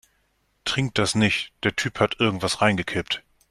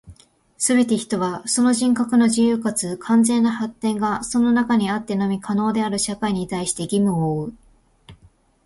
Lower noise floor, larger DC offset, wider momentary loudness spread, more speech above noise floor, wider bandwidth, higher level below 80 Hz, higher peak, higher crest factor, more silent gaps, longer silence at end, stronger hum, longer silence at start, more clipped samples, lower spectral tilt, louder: first, -68 dBFS vs -55 dBFS; neither; about the same, 7 LU vs 7 LU; first, 45 dB vs 35 dB; first, 13.5 kHz vs 11.5 kHz; about the same, -54 dBFS vs -54 dBFS; about the same, -4 dBFS vs -6 dBFS; first, 20 dB vs 14 dB; neither; second, 0.3 s vs 0.5 s; neither; first, 0.65 s vs 0.05 s; neither; about the same, -4 dB/octave vs -4.5 dB/octave; second, -23 LUFS vs -20 LUFS